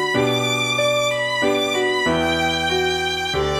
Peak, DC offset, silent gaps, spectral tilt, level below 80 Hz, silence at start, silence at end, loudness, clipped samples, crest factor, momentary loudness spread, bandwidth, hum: -6 dBFS; under 0.1%; none; -3.5 dB/octave; -42 dBFS; 0 s; 0 s; -19 LUFS; under 0.1%; 14 dB; 2 LU; 15.5 kHz; none